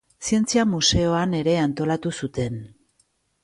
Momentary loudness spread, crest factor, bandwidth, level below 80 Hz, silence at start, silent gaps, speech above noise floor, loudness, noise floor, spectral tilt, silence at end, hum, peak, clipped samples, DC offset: 10 LU; 16 dB; 11.5 kHz; -42 dBFS; 0.2 s; none; 45 dB; -22 LUFS; -67 dBFS; -4.5 dB/octave; 0.75 s; none; -8 dBFS; under 0.1%; under 0.1%